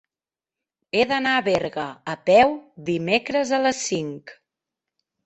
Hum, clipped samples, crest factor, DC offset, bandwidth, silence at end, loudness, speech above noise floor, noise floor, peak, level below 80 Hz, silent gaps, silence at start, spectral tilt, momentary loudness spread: none; under 0.1%; 20 dB; under 0.1%; 8.4 kHz; 0.95 s; -21 LUFS; over 68 dB; under -90 dBFS; -2 dBFS; -60 dBFS; none; 0.95 s; -4 dB/octave; 14 LU